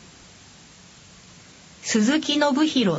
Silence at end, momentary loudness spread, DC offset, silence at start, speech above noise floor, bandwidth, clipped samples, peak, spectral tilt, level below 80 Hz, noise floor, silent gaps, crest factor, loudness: 0 s; 5 LU; under 0.1%; 1.85 s; 28 dB; 8 kHz; under 0.1%; -8 dBFS; -4 dB/octave; -62 dBFS; -48 dBFS; none; 18 dB; -21 LUFS